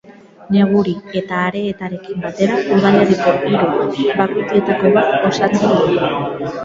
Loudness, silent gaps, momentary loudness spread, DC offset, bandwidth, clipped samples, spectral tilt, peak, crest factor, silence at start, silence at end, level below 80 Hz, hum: -15 LUFS; none; 10 LU; under 0.1%; 7.6 kHz; under 0.1%; -6.5 dB/octave; 0 dBFS; 14 dB; 0.1 s; 0 s; -52 dBFS; none